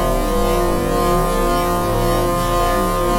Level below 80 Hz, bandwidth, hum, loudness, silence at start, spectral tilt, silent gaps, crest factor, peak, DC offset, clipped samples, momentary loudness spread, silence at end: -24 dBFS; 16.5 kHz; none; -18 LUFS; 0 s; -5.5 dB/octave; none; 12 dB; -4 dBFS; under 0.1%; under 0.1%; 1 LU; 0 s